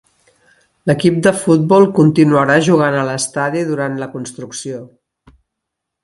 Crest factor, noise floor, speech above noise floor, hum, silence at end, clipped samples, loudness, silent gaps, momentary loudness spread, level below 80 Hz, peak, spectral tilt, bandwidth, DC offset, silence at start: 16 dB; -78 dBFS; 65 dB; none; 1.2 s; under 0.1%; -13 LUFS; none; 16 LU; -54 dBFS; 0 dBFS; -6 dB/octave; 11.5 kHz; under 0.1%; 0.85 s